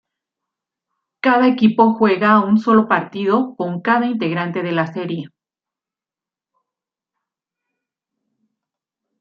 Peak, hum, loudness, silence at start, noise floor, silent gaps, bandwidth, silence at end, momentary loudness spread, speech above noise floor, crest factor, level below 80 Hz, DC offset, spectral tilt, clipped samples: -2 dBFS; none; -16 LUFS; 1.25 s; -90 dBFS; none; 5.8 kHz; 3.95 s; 9 LU; 74 dB; 18 dB; -66 dBFS; under 0.1%; -8.5 dB/octave; under 0.1%